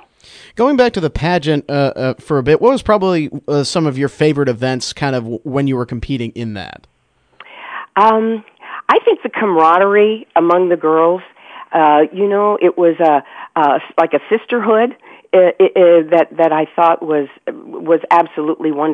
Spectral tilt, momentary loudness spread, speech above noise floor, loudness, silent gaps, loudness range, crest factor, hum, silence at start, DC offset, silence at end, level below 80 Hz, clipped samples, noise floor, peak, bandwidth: -6.5 dB/octave; 11 LU; 32 dB; -14 LUFS; none; 6 LU; 14 dB; none; 0.55 s; under 0.1%; 0 s; -42 dBFS; under 0.1%; -46 dBFS; 0 dBFS; 10 kHz